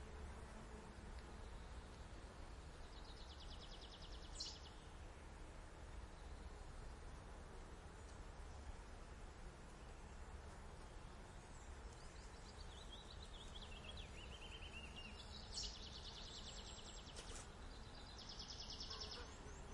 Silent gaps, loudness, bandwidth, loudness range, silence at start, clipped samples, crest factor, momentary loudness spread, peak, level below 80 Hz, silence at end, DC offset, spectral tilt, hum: none; -56 LUFS; 11.5 kHz; 5 LU; 0 s; under 0.1%; 20 dB; 8 LU; -36 dBFS; -58 dBFS; 0 s; under 0.1%; -3.5 dB/octave; none